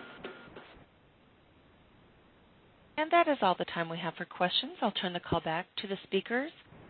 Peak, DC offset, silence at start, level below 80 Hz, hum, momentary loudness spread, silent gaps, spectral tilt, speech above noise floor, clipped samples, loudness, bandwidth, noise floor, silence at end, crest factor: -14 dBFS; under 0.1%; 0 s; -64 dBFS; none; 19 LU; none; -2.5 dB/octave; 31 dB; under 0.1%; -32 LUFS; 4.5 kHz; -63 dBFS; 0 s; 22 dB